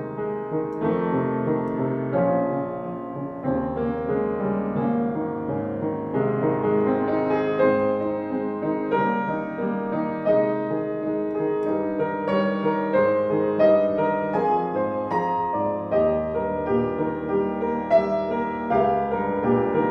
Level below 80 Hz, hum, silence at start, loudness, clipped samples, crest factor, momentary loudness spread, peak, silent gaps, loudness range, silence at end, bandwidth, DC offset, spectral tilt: -52 dBFS; none; 0 s; -24 LUFS; under 0.1%; 16 dB; 7 LU; -8 dBFS; none; 3 LU; 0 s; 6 kHz; under 0.1%; -10 dB/octave